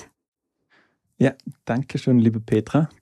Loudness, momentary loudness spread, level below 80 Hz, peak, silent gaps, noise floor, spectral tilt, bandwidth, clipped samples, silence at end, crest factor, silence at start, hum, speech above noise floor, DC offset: -22 LUFS; 9 LU; -58 dBFS; -6 dBFS; 0.28-0.32 s; -64 dBFS; -8 dB/octave; 10.5 kHz; under 0.1%; 0.15 s; 16 dB; 0 s; none; 43 dB; under 0.1%